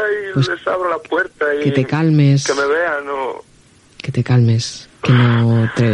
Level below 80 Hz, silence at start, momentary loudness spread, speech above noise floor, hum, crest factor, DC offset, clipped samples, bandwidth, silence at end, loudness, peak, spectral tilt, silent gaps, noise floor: -54 dBFS; 0 s; 11 LU; 34 dB; none; 16 dB; under 0.1%; under 0.1%; 9.8 kHz; 0 s; -16 LUFS; 0 dBFS; -6.5 dB/octave; none; -48 dBFS